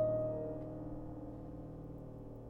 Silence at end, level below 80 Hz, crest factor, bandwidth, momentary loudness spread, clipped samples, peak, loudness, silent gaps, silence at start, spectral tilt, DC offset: 0 s; -56 dBFS; 16 dB; 3.5 kHz; 12 LU; under 0.1%; -24 dBFS; -44 LUFS; none; 0 s; -11.5 dB/octave; under 0.1%